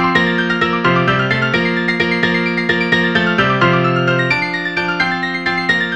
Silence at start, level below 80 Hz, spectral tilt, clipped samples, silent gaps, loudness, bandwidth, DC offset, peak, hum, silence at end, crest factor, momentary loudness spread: 0 s; -48 dBFS; -6 dB/octave; under 0.1%; none; -14 LUFS; 9.2 kHz; 0.5%; 0 dBFS; none; 0 s; 16 dB; 3 LU